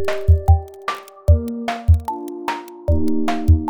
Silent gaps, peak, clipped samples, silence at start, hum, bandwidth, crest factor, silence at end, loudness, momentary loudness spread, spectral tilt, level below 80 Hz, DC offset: none; -2 dBFS; under 0.1%; 0 s; none; 11 kHz; 16 dB; 0 s; -20 LUFS; 11 LU; -8 dB/octave; -22 dBFS; under 0.1%